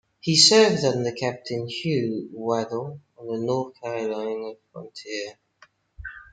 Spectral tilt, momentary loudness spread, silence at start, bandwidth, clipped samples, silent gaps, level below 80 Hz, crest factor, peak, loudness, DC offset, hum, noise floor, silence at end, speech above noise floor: -3.5 dB/octave; 24 LU; 0.25 s; 9.4 kHz; under 0.1%; none; -58 dBFS; 22 dB; -2 dBFS; -23 LUFS; under 0.1%; none; -58 dBFS; 0.1 s; 34 dB